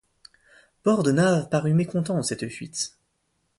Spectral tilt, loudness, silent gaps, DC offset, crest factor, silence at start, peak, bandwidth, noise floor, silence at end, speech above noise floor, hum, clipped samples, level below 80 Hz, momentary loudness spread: -5.5 dB/octave; -24 LUFS; none; under 0.1%; 16 dB; 0.85 s; -10 dBFS; 11.5 kHz; -73 dBFS; 0.7 s; 50 dB; none; under 0.1%; -62 dBFS; 11 LU